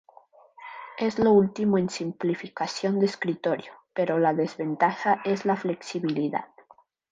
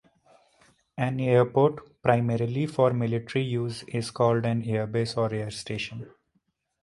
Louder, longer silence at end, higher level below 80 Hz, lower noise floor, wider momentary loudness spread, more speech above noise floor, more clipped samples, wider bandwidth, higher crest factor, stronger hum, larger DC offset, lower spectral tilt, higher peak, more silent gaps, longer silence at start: about the same, -26 LUFS vs -26 LUFS; about the same, 0.65 s vs 0.75 s; second, -66 dBFS vs -60 dBFS; second, -58 dBFS vs -73 dBFS; about the same, 12 LU vs 10 LU; second, 33 dB vs 48 dB; neither; second, 9.4 kHz vs 11.5 kHz; about the same, 18 dB vs 22 dB; neither; neither; about the same, -6.5 dB/octave vs -7 dB/octave; second, -10 dBFS vs -4 dBFS; neither; second, 0.6 s vs 0.95 s